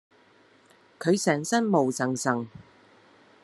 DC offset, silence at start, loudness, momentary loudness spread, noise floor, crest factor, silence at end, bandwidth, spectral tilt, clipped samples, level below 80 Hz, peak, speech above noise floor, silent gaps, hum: under 0.1%; 1 s; -26 LUFS; 8 LU; -59 dBFS; 20 dB; 0.85 s; 13 kHz; -5 dB/octave; under 0.1%; -74 dBFS; -8 dBFS; 34 dB; none; none